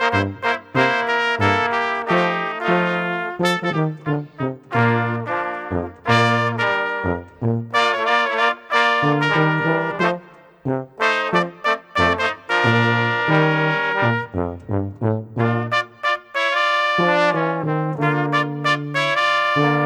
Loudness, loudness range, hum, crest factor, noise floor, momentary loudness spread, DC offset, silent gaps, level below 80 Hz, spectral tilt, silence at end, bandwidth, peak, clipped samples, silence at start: -19 LUFS; 2 LU; none; 18 dB; -41 dBFS; 8 LU; under 0.1%; none; -54 dBFS; -6 dB/octave; 0 s; 14 kHz; -2 dBFS; under 0.1%; 0 s